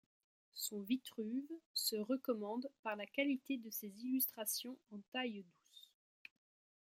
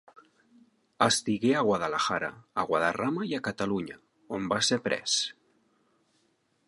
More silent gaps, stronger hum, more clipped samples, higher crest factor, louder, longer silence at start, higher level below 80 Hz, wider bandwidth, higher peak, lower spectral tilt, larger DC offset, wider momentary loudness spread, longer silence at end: first, 1.66-1.74 s, 2.79-2.83 s, 5.08-5.12 s vs none; neither; neither; about the same, 20 dB vs 22 dB; second, -42 LUFS vs -28 LUFS; second, 0.55 s vs 1 s; second, under -90 dBFS vs -66 dBFS; first, 16.5 kHz vs 11.5 kHz; second, -22 dBFS vs -8 dBFS; about the same, -2.5 dB/octave vs -3 dB/octave; neither; first, 23 LU vs 9 LU; second, 1 s vs 1.35 s